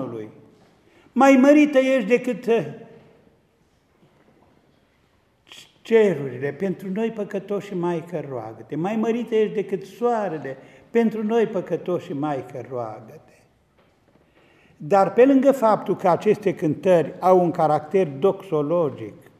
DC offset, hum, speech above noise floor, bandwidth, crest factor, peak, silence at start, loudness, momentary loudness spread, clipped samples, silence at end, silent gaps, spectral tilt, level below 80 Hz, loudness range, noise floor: under 0.1%; none; 42 dB; 14 kHz; 20 dB; -2 dBFS; 0 s; -21 LUFS; 17 LU; under 0.1%; 0.3 s; none; -7 dB/octave; -70 dBFS; 9 LU; -62 dBFS